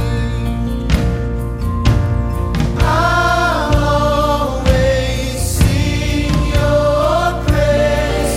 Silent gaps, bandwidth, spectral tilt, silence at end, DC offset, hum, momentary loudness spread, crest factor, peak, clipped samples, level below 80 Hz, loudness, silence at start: none; 16 kHz; -6 dB/octave; 0 s; under 0.1%; none; 6 LU; 14 dB; 0 dBFS; under 0.1%; -20 dBFS; -15 LUFS; 0 s